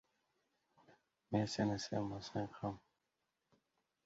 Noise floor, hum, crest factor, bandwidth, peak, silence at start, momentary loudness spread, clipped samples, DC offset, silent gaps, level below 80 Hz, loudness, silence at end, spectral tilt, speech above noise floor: -87 dBFS; none; 22 dB; 7.6 kHz; -22 dBFS; 0.9 s; 8 LU; under 0.1%; under 0.1%; none; -70 dBFS; -41 LUFS; 1.25 s; -5.5 dB/octave; 47 dB